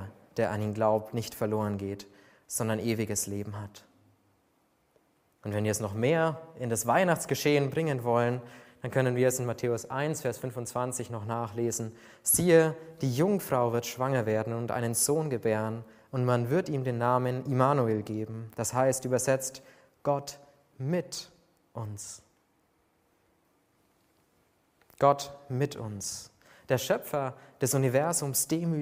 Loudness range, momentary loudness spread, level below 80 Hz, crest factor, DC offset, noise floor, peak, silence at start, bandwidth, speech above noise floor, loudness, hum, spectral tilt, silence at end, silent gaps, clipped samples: 8 LU; 13 LU; -66 dBFS; 22 dB; under 0.1%; -70 dBFS; -8 dBFS; 0 s; 16 kHz; 41 dB; -29 LUFS; none; -5 dB/octave; 0 s; none; under 0.1%